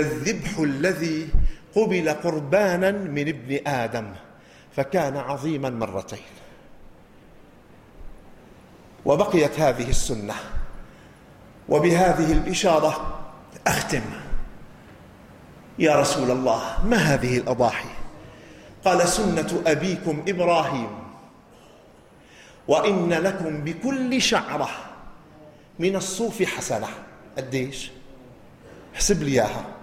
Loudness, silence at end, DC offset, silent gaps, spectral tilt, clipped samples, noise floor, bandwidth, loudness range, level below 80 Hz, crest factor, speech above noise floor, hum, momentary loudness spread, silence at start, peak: -23 LUFS; 0 s; under 0.1%; none; -4.5 dB/octave; under 0.1%; -51 dBFS; 16 kHz; 6 LU; -36 dBFS; 18 dB; 28 dB; none; 18 LU; 0 s; -6 dBFS